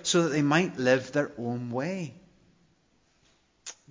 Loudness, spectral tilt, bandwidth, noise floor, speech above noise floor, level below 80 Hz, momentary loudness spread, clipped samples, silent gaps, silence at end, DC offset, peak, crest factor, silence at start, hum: -27 LUFS; -4.5 dB/octave; 7.6 kHz; -68 dBFS; 41 dB; -70 dBFS; 19 LU; under 0.1%; none; 0.15 s; under 0.1%; -10 dBFS; 20 dB; 0 s; none